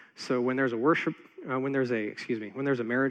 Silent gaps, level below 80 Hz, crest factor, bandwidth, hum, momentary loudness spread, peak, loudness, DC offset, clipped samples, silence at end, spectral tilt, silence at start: none; -86 dBFS; 16 dB; 9.4 kHz; none; 8 LU; -12 dBFS; -29 LUFS; under 0.1%; under 0.1%; 0 s; -6.5 dB/octave; 0.2 s